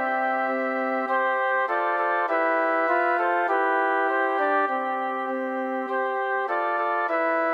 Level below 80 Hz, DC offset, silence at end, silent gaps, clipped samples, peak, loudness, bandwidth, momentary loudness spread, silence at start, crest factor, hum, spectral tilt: under -90 dBFS; under 0.1%; 0 s; none; under 0.1%; -10 dBFS; -24 LUFS; 9.2 kHz; 5 LU; 0 s; 14 dB; none; -4 dB/octave